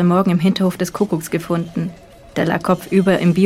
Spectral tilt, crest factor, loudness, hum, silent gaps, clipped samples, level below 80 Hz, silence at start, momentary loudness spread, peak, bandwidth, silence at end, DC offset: -7 dB/octave; 14 dB; -18 LUFS; none; none; under 0.1%; -50 dBFS; 0 s; 10 LU; -2 dBFS; 15 kHz; 0 s; under 0.1%